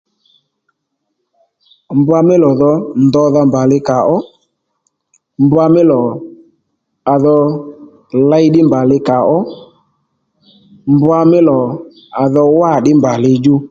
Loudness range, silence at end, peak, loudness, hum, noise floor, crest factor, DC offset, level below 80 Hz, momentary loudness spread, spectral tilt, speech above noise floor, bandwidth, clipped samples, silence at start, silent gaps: 2 LU; 0.05 s; 0 dBFS; -11 LUFS; none; -70 dBFS; 12 dB; under 0.1%; -52 dBFS; 11 LU; -8.5 dB/octave; 60 dB; 7.4 kHz; under 0.1%; 1.9 s; none